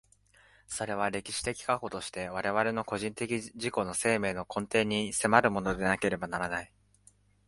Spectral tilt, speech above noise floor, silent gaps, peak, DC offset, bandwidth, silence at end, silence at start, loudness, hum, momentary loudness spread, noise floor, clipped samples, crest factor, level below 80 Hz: -4 dB/octave; 33 dB; none; -6 dBFS; under 0.1%; 11.5 kHz; 0.8 s; 0.7 s; -31 LUFS; 50 Hz at -55 dBFS; 10 LU; -64 dBFS; under 0.1%; 26 dB; -58 dBFS